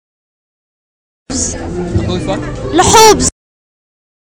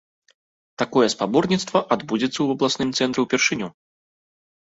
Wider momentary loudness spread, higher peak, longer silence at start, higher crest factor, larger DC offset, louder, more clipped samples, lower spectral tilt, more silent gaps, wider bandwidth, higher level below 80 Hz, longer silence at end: first, 14 LU vs 5 LU; about the same, 0 dBFS vs -2 dBFS; first, 1.3 s vs 0.8 s; second, 14 dB vs 20 dB; neither; first, -11 LUFS vs -21 LUFS; first, 0.1% vs under 0.1%; about the same, -3.5 dB/octave vs -4 dB/octave; neither; first, over 20 kHz vs 8 kHz; first, -30 dBFS vs -62 dBFS; about the same, 0.95 s vs 1 s